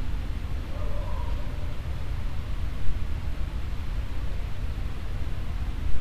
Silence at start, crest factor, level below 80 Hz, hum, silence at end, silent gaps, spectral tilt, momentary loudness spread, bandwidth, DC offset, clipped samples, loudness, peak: 0 s; 16 dB; -30 dBFS; none; 0 s; none; -6.5 dB/octave; 2 LU; 13 kHz; 3%; under 0.1%; -34 LUFS; -8 dBFS